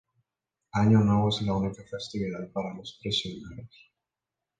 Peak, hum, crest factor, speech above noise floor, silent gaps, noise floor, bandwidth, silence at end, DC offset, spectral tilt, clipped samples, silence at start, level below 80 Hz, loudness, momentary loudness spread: -10 dBFS; none; 18 dB; 61 dB; none; -88 dBFS; 9.2 kHz; 0.9 s; under 0.1%; -6.5 dB/octave; under 0.1%; 0.75 s; -54 dBFS; -28 LUFS; 17 LU